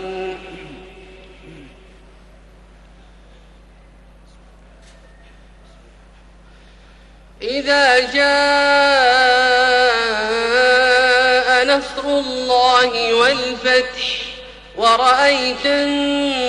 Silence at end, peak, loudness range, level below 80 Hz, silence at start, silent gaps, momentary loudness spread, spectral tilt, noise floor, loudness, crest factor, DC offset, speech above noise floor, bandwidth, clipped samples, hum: 0 s; -2 dBFS; 7 LU; -46 dBFS; 0 s; none; 14 LU; -2 dB/octave; -45 dBFS; -14 LUFS; 16 dB; under 0.1%; 29 dB; 10.5 kHz; under 0.1%; none